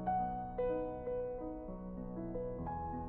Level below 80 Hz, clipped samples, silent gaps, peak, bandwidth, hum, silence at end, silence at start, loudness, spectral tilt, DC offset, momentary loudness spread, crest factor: -52 dBFS; under 0.1%; none; -26 dBFS; 3.8 kHz; none; 0 s; 0 s; -41 LUFS; -9 dB/octave; under 0.1%; 8 LU; 14 dB